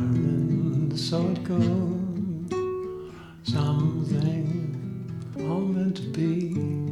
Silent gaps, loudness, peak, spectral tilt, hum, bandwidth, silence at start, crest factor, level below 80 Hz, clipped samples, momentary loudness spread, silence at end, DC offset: none; -27 LUFS; -12 dBFS; -8 dB/octave; none; 11.5 kHz; 0 s; 14 dB; -54 dBFS; under 0.1%; 10 LU; 0 s; under 0.1%